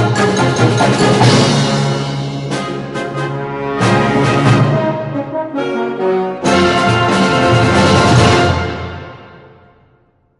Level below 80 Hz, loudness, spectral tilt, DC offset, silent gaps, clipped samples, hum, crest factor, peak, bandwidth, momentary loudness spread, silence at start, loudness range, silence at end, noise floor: -34 dBFS; -13 LUFS; -5.5 dB/octave; under 0.1%; none; under 0.1%; none; 14 dB; 0 dBFS; 11.5 kHz; 11 LU; 0 s; 3 LU; 1 s; -54 dBFS